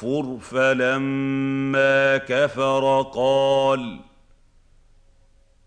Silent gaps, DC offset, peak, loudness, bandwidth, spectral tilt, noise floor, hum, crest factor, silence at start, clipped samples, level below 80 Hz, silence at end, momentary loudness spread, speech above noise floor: none; under 0.1%; -6 dBFS; -20 LUFS; 9.4 kHz; -5.5 dB/octave; -55 dBFS; none; 16 dB; 0 s; under 0.1%; -56 dBFS; 1.65 s; 8 LU; 35 dB